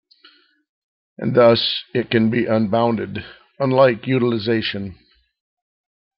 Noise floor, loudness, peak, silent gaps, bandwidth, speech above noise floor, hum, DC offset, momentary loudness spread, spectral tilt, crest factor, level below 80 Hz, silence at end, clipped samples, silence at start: -53 dBFS; -18 LUFS; -2 dBFS; none; 5.8 kHz; 36 dB; none; under 0.1%; 14 LU; -10 dB/octave; 18 dB; -58 dBFS; 1.25 s; under 0.1%; 1.2 s